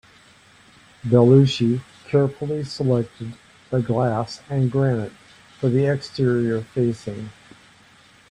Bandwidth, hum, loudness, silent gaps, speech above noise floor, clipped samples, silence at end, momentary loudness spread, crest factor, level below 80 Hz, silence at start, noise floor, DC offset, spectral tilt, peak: 9.8 kHz; none; -21 LUFS; none; 32 dB; under 0.1%; 1 s; 17 LU; 20 dB; -56 dBFS; 1.05 s; -52 dBFS; under 0.1%; -8 dB/octave; -2 dBFS